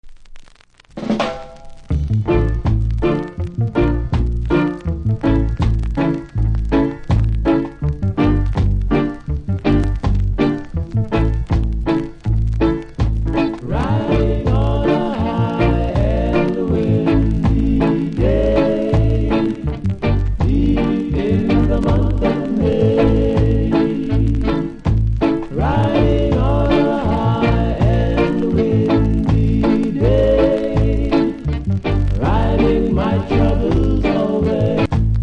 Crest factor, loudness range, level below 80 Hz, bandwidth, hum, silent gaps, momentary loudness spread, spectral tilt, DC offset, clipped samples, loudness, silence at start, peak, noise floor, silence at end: 14 dB; 3 LU; -22 dBFS; 8.2 kHz; none; none; 5 LU; -9 dB/octave; under 0.1%; under 0.1%; -17 LUFS; 0.05 s; -2 dBFS; -46 dBFS; 0 s